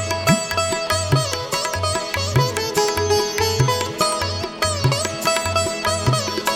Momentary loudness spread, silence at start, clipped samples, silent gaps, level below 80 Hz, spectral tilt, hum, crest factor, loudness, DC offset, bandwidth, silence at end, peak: 4 LU; 0 s; under 0.1%; none; -42 dBFS; -3.5 dB/octave; none; 18 dB; -20 LUFS; under 0.1%; 17.5 kHz; 0 s; -2 dBFS